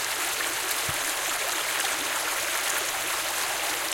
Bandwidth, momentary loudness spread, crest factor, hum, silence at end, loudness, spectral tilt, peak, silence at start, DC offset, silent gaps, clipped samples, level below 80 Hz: 17 kHz; 1 LU; 20 dB; none; 0 s; -26 LUFS; 0.5 dB/octave; -8 dBFS; 0 s; under 0.1%; none; under 0.1%; -60 dBFS